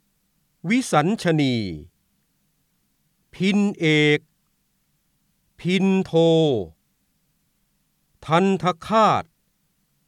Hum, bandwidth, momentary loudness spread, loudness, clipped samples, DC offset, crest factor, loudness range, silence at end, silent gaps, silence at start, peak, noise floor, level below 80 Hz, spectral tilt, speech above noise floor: none; 13 kHz; 12 LU; -20 LUFS; under 0.1%; under 0.1%; 18 dB; 3 LU; 0.85 s; none; 0.65 s; -4 dBFS; -69 dBFS; -58 dBFS; -6 dB/octave; 49 dB